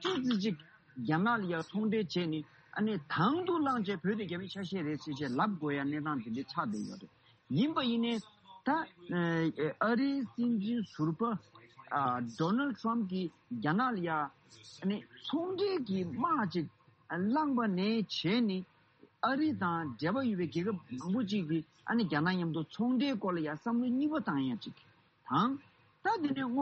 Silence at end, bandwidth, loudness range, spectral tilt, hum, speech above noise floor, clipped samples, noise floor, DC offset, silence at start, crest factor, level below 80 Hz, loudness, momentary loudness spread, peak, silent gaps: 0 s; 8.2 kHz; 2 LU; -7 dB/octave; none; 31 dB; under 0.1%; -64 dBFS; under 0.1%; 0 s; 18 dB; -76 dBFS; -34 LUFS; 8 LU; -16 dBFS; none